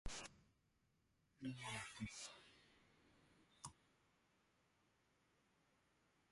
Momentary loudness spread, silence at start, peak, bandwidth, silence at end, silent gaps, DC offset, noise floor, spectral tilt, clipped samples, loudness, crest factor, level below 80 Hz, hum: 10 LU; 0.05 s; -36 dBFS; 11.5 kHz; 2.6 s; none; under 0.1%; -82 dBFS; -3 dB/octave; under 0.1%; -53 LUFS; 22 dB; -68 dBFS; none